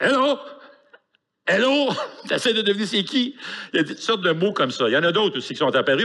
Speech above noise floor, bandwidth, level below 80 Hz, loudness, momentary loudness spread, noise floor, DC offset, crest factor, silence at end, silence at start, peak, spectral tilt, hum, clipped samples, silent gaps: 47 dB; 12 kHz; -76 dBFS; -21 LUFS; 9 LU; -68 dBFS; under 0.1%; 14 dB; 0 s; 0 s; -8 dBFS; -4 dB/octave; none; under 0.1%; none